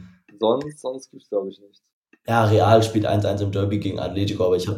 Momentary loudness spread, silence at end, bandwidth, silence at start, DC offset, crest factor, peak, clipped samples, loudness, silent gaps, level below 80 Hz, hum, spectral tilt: 16 LU; 0 s; 15 kHz; 0 s; under 0.1%; 20 dB; -2 dBFS; under 0.1%; -21 LUFS; 1.92-2.02 s; -56 dBFS; none; -7 dB/octave